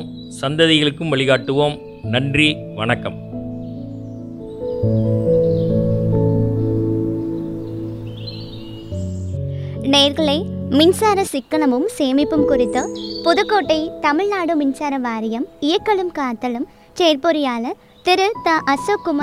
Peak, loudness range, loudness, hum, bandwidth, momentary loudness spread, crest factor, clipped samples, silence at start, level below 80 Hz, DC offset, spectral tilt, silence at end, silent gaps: 0 dBFS; 5 LU; -18 LUFS; none; 15 kHz; 15 LU; 18 dB; under 0.1%; 0 s; -44 dBFS; under 0.1%; -5.5 dB/octave; 0 s; none